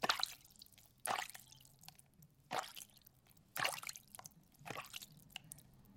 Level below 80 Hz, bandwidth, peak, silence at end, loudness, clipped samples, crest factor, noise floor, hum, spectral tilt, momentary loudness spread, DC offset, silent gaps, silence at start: -78 dBFS; 16.5 kHz; -16 dBFS; 0 s; -45 LUFS; under 0.1%; 30 dB; -68 dBFS; none; -1 dB/octave; 20 LU; under 0.1%; none; 0 s